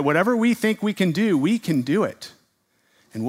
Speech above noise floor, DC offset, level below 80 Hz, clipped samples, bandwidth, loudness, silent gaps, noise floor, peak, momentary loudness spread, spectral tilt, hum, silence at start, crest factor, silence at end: 46 dB; under 0.1%; -70 dBFS; under 0.1%; 16 kHz; -21 LUFS; none; -66 dBFS; -4 dBFS; 15 LU; -6 dB/octave; none; 0 s; 18 dB; 0 s